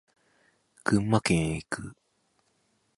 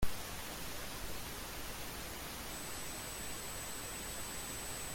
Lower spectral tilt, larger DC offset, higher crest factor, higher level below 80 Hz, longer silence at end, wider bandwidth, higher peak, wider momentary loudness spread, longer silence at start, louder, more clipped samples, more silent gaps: first, -5.5 dB/octave vs -2 dB/octave; neither; about the same, 24 dB vs 20 dB; about the same, -52 dBFS vs -52 dBFS; first, 1.05 s vs 0 s; second, 11.5 kHz vs 17 kHz; first, -8 dBFS vs -22 dBFS; first, 12 LU vs 2 LU; first, 0.85 s vs 0 s; first, -28 LUFS vs -43 LUFS; neither; neither